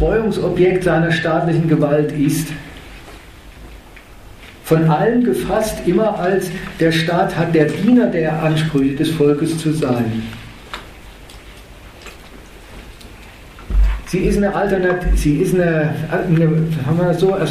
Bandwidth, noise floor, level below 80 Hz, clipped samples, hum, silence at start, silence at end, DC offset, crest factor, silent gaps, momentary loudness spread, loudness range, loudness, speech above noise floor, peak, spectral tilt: 14.5 kHz; -39 dBFS; -28 dBFS; under 0.1%; none; 0 s; 0 s; under 0.1%; 16 dB; none; 20 LU; 10 LU; -16 LUFS; 23 dB; 0 dBFS; -6.5 dB/octave